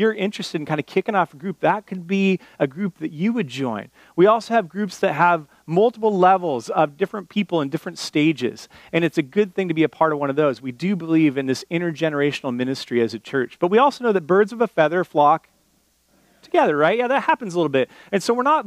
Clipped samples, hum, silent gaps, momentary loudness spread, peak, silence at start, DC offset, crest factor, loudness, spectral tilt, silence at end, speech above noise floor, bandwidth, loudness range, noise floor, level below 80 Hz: under 0.1%; none; none; 9 LU; -2 dBFS; 0 s; under 0.1%; 18 dB; -21 LUFS; -6 dB/octave; 0 s; 42 dB; 15 kHz; 3 LU; -62 dBFS; -70 dBFS